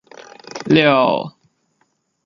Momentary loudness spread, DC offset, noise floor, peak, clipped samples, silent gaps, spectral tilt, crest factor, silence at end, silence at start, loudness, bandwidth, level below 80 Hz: 20 LU; under 0.1%; -66 dBFS; 0 dBFS; under 0.1%; none; -6 dB/octave; 18 dB; 0.95 s; 0.55 s; -15 LUFS; 7.4 kHz; -58 dBFS